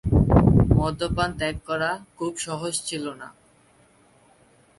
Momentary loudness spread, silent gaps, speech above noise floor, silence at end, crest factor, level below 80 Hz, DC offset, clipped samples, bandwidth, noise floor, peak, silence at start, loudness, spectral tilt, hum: 14 LU; none; 30 dB; 1.5 s; 20 dB; -32 dBFS; under 0.1%; under 0.1%; 11.5 kHz; -58 dBFS; -2 dBFS; 0.05 s; -23 LUFS; -6 dB/octave; none